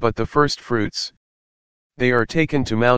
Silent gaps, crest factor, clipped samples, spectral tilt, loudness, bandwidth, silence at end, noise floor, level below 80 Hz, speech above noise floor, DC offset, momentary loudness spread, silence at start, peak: 1.17-1.90 s; 20 dB; under 0.1%; -5.5 dB/octave; -20 LUFS; 9.6 kHz; 0 s; under -90 dBFS; -44 dBFS; over 71 dB; under 0.1%; 7 LU; 0 s; 0 dBFS